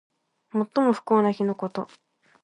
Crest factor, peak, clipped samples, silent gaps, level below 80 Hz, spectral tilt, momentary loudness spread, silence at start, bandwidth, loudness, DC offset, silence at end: 18 dB; -8 dBFS; under 0.1%; none; -76 dBFS; -8 dB/octave; 12 LU; 0.55 s; 10.5 kHz; -25 LUFS; under 0.1%; 0.6 s